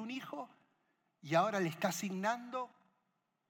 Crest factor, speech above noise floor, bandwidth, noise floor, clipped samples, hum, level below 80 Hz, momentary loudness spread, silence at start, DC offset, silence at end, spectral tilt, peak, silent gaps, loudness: 20 dB; 46 dB; 18 kHz; -83 dBFS; under 0.1%; none; under -90 dBFS; 16 LU; 0 s; under 0.1%; 0.85 s; -4.5 dB/octave; -18 dBFS; none; -37 LUFS